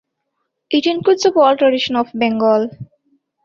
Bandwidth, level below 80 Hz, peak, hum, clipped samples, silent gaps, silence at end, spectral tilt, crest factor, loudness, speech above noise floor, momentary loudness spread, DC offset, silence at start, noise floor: 7.6 kHz; -62 dBFS; -2 dBFS; none; under 0.1%; none; 0.6 s; -4.5 dB/octave; 14 dB; -15 LUFS; 58 dB; 6 LU; under 0.1%; 0.7 s; -73 dBFS